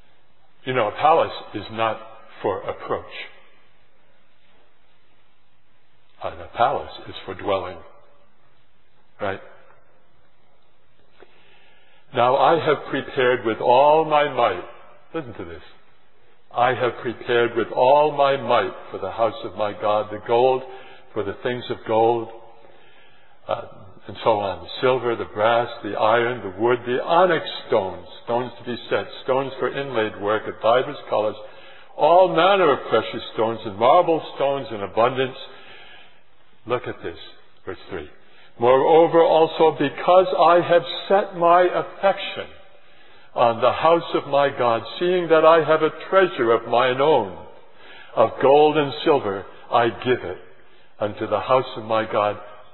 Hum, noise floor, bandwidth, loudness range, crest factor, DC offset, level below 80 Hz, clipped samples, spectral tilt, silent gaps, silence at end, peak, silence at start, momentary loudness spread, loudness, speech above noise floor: none; -64 dBFS; 4.3 kHz; 12 LU; 20 dB; 0.8%; -62 dBFS; under 0.1%; -9 dB/octave; none; 0.2 s; -2 dBFS; 0.65 s; 17 LU; -20 LUFS; 44 dB